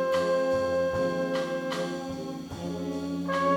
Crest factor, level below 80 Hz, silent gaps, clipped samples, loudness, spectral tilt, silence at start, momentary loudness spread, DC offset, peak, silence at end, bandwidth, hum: 14 dB; -58 dBFS; none; under 0.1%; -29 LUFS; -5.5 dB/octave; 0 s; 10 LU; under 0.1%; -14 dBFS; 0 s; 18.5 kHz; none